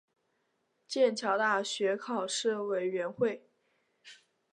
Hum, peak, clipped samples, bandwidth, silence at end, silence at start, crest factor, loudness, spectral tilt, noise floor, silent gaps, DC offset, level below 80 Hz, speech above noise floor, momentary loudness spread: none; -16 dBFS; under 0.1%; 11 kHz; 0.4 s; 0.9 s; 18 dB; -31 LUFS; -3 dB/octave; -77 dBFS; none; under 0.1%; -84 dBFS; 47 dB; 6 LU